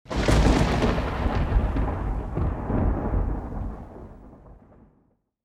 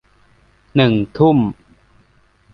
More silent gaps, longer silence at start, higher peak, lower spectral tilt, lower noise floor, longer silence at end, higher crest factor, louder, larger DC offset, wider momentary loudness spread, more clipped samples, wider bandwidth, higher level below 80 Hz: neither; second, 0.1 s vs 0.75 s; second, -6 dBFS vs -2 dBFS; second, -6.5 dB/octave vs -9.5 dB/octave; first, -66 dBFS vs -55 dBFS; about the same, 0.9 s vs 1 s; about the same, 18 dB vs 16 dB; second, -26 LUFS vs -16 LUFS; neither; first, 16 LU vs 7 LU; neither; first, 11.5 kHz vs 6 kHz; first, -28 dBFS vs -48 dBFS